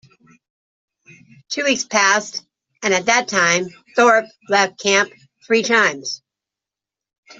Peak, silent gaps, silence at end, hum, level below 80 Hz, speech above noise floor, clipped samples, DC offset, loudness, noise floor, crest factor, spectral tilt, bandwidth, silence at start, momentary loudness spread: -2 dBFS; 7.18-7.23 s; 0.05 s; none; -66 dBFS; 70 dB; under 0.1%; under 0.1%; -17 LUFS; -88 dBFS; 18 dB; -2 dB/octave; 8 kHz; 1.5 s; 13 LU